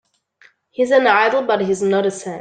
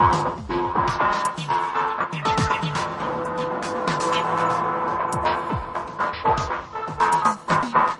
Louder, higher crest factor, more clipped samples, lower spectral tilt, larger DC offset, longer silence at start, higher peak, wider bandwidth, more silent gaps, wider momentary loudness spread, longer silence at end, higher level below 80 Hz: first, -16 LUFS vs -23 LUFS; about the same, 16 dB vs 18 dB; neither; about the same, -4.5 dB/octave vs -5 dB/octave; neither; first, 0.8 s vs 0 s; about the same, -2 dBFS vs -4 dBFS; second, 9.4 kHz vs 11.5 kHz; neither; first, 9 LU vs 6 LU; about the same, 0 s vs 0 s; second, -64 dBFS vs -46 dBFS